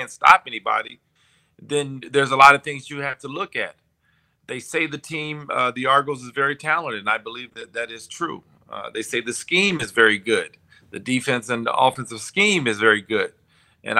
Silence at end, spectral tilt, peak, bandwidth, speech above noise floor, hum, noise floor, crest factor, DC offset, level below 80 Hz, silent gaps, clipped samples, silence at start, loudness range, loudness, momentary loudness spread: 0 s; -3.5 dB/octave; 0 dBFS; 16 kHz; 44 dB; none; -65 dBFS; 22 dB; under 0.1%; -66 dBFS; none; under 0.1%; 0 s; 5 LU; -20 LUFS; 17 LU